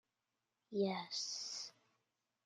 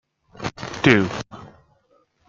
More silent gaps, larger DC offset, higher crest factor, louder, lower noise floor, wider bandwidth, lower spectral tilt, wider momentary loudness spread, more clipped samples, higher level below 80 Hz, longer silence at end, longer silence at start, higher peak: neither; neither; about the same, 20 dB vs 22 dB; second, -42 LUFS vs -21 LUFS; first, -90 dBFS vs -62 dBFS; first, 11 kHz vs 7.6 kHz; second, -3.5 dB/octave vs -5.5 dB/octave; second, 8 LU vs 21 LU; neither; second, under -90 dBFS vs -54 dBFS; about the same, 0.75 s vs 0.8 s; first, 0.7 s vs 0.4 s; second, -26 dBFS vs -2 dBFS